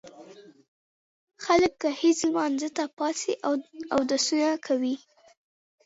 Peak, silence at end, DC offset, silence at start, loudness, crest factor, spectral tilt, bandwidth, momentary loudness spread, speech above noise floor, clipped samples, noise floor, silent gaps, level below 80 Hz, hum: -8 dBFS; 0.9 s; under 0.1%; 0.05 s; -26 LUFS; 18 dB; -2.5 dB/octave; 8 kHz; 8 LU; 24 dB; under 0.1%; -49 dBFS; 0.68-1.27 s, 2.93-2.97 s; -64 dBFS; none